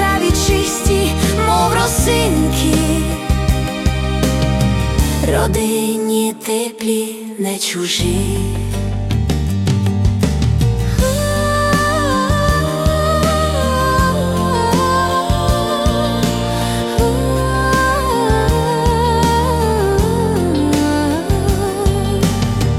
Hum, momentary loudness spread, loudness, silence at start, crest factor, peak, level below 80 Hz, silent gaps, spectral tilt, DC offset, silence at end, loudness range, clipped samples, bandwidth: none; 4 LU; -16 LUFS; 0 s; 12 dB; -4 dBFS; -22 dBFS; none; -5 dB/octave; under 0.1%; 0 s; 3 LU; under 0.1%; 16.5 kHz